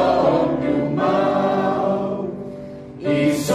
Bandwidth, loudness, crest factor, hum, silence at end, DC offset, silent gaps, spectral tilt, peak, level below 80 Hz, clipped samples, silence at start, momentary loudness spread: 15 kHz; -20 LUFS; 14 dB; none; 0 s; under 0.1%; none; -6.5 dB/octave; -4 dBFS; -50 dBFS; under 0.1%; 0 s; 14 LU